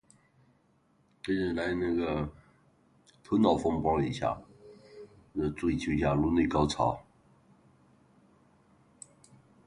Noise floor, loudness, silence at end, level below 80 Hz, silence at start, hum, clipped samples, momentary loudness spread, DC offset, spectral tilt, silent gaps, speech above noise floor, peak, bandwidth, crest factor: -68 dBFS; -30 LUFS; 2.65 s; -50 dBFS; 1.25 s; none; under 0.1%; 25 LU; under 0.1%; -6.5 dB/octave; none; 40 dB; -10 dBFS; 11 kHz; 22 dB